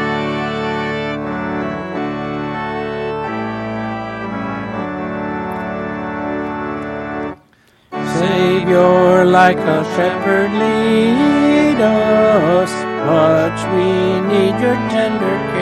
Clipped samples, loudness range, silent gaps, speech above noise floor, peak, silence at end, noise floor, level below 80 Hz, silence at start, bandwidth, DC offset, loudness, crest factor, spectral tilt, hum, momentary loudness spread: under 0.1%; 10 LU; none; 39 dB; 0 dBFS; 0 s; -52 dBFS; -46 dBFS; 0 s; 13 kHz; under 0.1%; -16 LUFS; 16 dB; -6.5 dB/octave; none; 11 LU